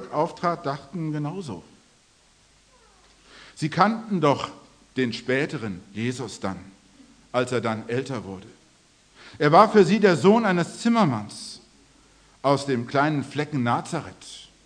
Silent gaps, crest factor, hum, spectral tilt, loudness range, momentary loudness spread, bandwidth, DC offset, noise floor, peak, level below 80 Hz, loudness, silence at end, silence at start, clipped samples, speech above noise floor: none; 24 dB; none; -6 dB/octave; 10 LU; 19 LU; 10.5 kHz; under 0.1%; -59 dBFS; -2 dBFS; -64 dBFS; -23 LUFS; 0.2 s; 0 s; under 0.1%; 36 dB